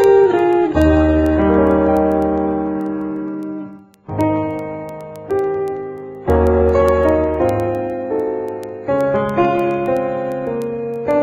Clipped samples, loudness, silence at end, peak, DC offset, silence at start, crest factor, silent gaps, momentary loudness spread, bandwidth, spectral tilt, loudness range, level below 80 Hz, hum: under 0.1%; -17 LUFS; 0 s; -2 dBFS; under 0.1%; 0 s; 14 dB; none; 13 LU; 15.5 kHz; -8.5 dB/octave; 7 LU; -30 dBFS; none